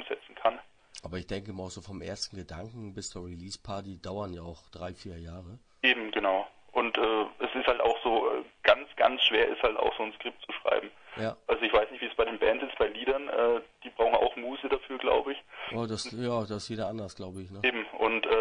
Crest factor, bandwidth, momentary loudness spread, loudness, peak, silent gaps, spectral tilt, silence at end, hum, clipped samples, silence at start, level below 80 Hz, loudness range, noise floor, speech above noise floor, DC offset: 24 dB; 10.5 kHz; 16 LU; -30 LUFS; -8 dBFS; none; -4 dB/octave; 0 s; none; under 0.1%; 0 s; -56 dBFS; 13 LU; -50 dBFS; 19 dB; under 0.1%